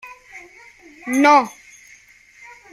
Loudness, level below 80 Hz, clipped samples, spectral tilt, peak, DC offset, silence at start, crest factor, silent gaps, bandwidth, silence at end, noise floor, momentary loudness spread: -16 LUFS; -66 dBFS; under 0.1%; -3 dB/octave; -2 dBFS; under 0.1%; 0.05 s; 20 dB; none; 15.5 kHz; 1.25 s; -49 dBFS; 26 LU